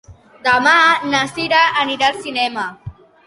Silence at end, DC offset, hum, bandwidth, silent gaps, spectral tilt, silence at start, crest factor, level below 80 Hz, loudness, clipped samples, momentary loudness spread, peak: 0.35 s; under 0.1%; none; 11.5 kHz; none; -2.5 dB/octave; 0.1 s; 16 dB; -52 dBFS; -15 LUFS; under 0.1%; 10 LU; -2 dBFS